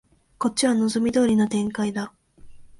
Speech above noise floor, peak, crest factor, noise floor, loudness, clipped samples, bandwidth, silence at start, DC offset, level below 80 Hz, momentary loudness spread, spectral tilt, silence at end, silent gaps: 22 dB; -8 dBFS; 16 dB; -44 dBFS; -22 LUFS; under 0.1%; 11.5 kHz; 0.4 s; under 0.1%; -56 dBFS; 9 LU; -4.5 dB/octave; 0.15 s; none